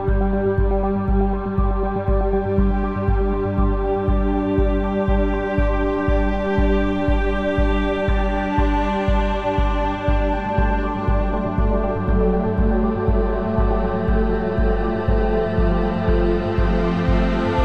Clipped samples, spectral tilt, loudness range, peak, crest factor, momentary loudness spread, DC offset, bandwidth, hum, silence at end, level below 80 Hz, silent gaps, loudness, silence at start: under 0.1%; -9 dB/octave; 1 LU; -6 dBFS; 12 dB; 2 LU; under 0.1%; 5.6 kHz; none; 0 s; -22 dBFS; none; -20 LUFS; 0 s